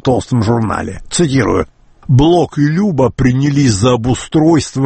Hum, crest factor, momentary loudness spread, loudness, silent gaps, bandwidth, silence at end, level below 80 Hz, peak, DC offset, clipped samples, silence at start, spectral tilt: none; 12 dB; 7 LU; -13 LUFS; none; 8.8 kHz; 0 s; -32 dBFS; 0 dBFS; under 0.1%; under 0.1%; 0.05 s; -6 dB/octave